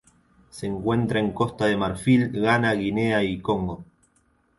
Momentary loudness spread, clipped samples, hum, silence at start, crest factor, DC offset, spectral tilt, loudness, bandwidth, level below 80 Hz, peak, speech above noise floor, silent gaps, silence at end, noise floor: 10 LU; under 0.1%; none; 0.55 s; 16 dB; under 0.1%; -6.5 dB/octave; -23 LUFS; 11.5 kHz; -50 dBFS; -8 dBFS; 42 dB; none; 0.75 s; -65 dBFS